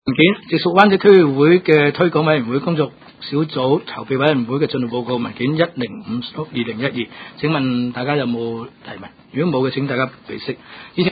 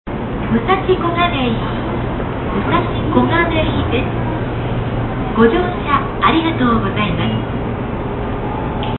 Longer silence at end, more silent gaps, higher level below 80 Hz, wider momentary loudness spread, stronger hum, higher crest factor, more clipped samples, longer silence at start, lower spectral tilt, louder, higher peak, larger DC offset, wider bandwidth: about the same, 0 s vs 0 s; neither; second, -58 dBFS vs -28 dBFS; first, 16 LU vs 8 LU; neither; about the same, 18 dB vs 16 dB; neither; about the same, 0.05 s vs 0.05 s; second, -8.5 dB/octave vs -11.5 dB/octave; about the same, -17 LUFS vs -17 LUFS; about the same, 0 dBFS vs 0 dBFS; neither; first, 5 kHz vs 4.3 kHz